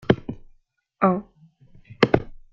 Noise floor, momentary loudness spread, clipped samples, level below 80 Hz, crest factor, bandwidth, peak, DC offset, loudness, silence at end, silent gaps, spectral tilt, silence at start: -60 dBFS; 15 LU; under 0.1%; -48 dBFS; 24 dB; 7.2 kHz; 0 dBFS; under 0.1%; -23 LUFS; 0.2 s; none; -7.5 dB/octave; 0.1 s